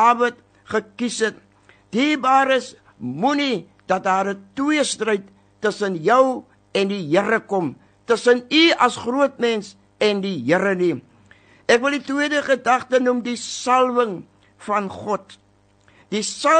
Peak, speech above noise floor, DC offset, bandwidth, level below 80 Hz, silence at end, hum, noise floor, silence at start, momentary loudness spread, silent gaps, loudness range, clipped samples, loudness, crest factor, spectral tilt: -2 dBFS; 37 dB; under 0.1%; 9.4 kHz; -66 dBFS; 0 s; none; -56 dBFS; 0 s; 11 LU; none; 3 LU; under 0.1%; -20 LUFS; 18 dB; -4 dB/octave